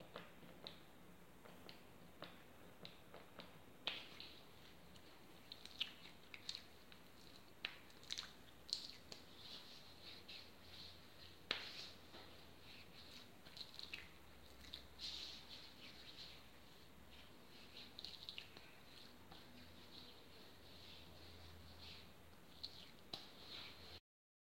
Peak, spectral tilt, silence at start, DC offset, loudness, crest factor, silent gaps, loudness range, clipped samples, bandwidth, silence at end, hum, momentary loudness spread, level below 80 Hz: -20 dBFS; -2.5 dB/octave; 0 s; under 0.1%; -55 LUFS; 36 dB; none; 7 LU; under 0.1%; 16.5 kHz; 0.4 s; none; 15 LU; -76 dBFS